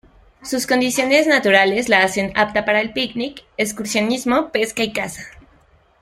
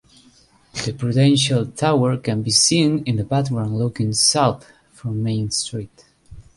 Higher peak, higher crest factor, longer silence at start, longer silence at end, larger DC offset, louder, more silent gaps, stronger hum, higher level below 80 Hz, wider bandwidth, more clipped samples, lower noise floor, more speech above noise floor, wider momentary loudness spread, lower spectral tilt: about the same, -2 dBFS vs -2 dBFS; about the same, 18 dB vs 18 dB; second, 0.45 s vs 0.75 s; first, 0.6 s vs 0.15 s; neither; about the same, -18 LUFS vs -19 LUFS; neither; neither; about the same, -52 dBFS vs -50 dBFS; first, 16 kHz vs 11.5 kHz; neither; about the same, -54 dBFS vs -53 dBFS; about the same, 36 dB vs 35 dB; about the same, 12 LU vs 13 LU; second, -3 dB/octave vs -4.5 dB/octave